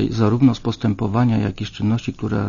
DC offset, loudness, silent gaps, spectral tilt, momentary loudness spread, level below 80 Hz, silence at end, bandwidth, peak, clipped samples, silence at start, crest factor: under 0.1%; -20 LUFS; none; -8 dB/octave; 8 LU; -42 dBFS; 0 s; 7.4 kHz; -2 dBFS; under 0.1%; 0 s; 16 dB